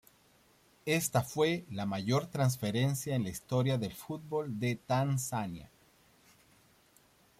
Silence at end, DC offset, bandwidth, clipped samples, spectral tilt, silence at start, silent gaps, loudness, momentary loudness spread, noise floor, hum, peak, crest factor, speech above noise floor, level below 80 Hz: 1.75 s; under 0.1%; 16 kHz; under 0.1%; -5.5 dB/octave; 0.85 s; none; -33 LUFS; 8 LU; -66 dBFS; none; -16 dBFS; 18 dB; 33 dB; -66 dBFS